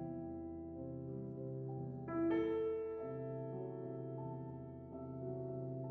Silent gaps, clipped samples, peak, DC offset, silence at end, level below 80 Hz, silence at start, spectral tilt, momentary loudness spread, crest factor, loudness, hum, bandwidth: none; under 0.1%; -28 dBFS; under 0.1%; 0 s; -68 dBFS; 0 s; -9 dB/octave; 11 LU; 16 dB; -44 LUFS; none; 3.8 kHz